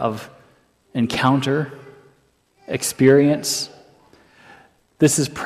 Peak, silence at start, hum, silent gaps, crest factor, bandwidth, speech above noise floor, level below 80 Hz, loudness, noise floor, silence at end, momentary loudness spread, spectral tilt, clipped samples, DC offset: -2 dBFS; 0 s; none; none; 18 dB; 15.5 kHz; 42 dB; -58 dBFS; -19 LUFS; -60 dBFS; 0 s; 16 LU; -4.5 dB/octave; under 0.1%; under 0.1%